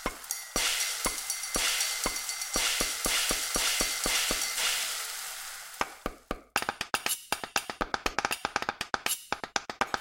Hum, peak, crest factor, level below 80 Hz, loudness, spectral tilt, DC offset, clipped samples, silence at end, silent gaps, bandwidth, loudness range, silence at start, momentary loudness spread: none; -6 dBFS; 26 dB; -50 dBFS; -29 LUFS; 0 dB/octave; under 0.1%; under 0.1%; 0 s; none; 17 kHz; 5 LU; 0 s; 9 LU